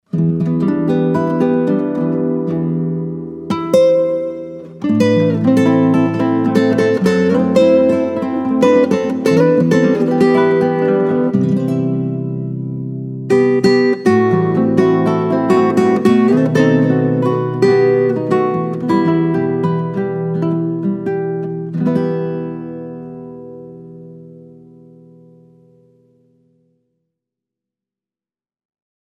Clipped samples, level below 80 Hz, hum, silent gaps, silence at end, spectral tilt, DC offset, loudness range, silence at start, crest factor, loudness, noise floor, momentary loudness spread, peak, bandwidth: under 0.1%; -56 dBFS; none; none; 4.65 s; -8 dB/octave; under 0.1%; 8 LU; 0.15 s; 14 dB; -15 LUFS; under -90 dBFS; 12 LU; 0 dBFS; 12 kHz